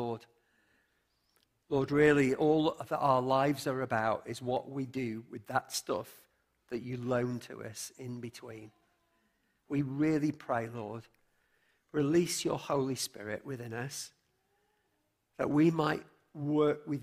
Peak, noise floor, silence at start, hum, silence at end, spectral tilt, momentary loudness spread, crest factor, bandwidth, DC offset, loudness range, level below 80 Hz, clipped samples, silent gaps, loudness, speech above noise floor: -12 dBFS; -78 dBFS; 0 s; none; 0 s; -5.5 dB/octave; 15 LU; 20 dB; 15.5 kHz; under 0.1%; 9 LU; -68 dBFS; under 0.1%; none; -33 LUFS; 46 dB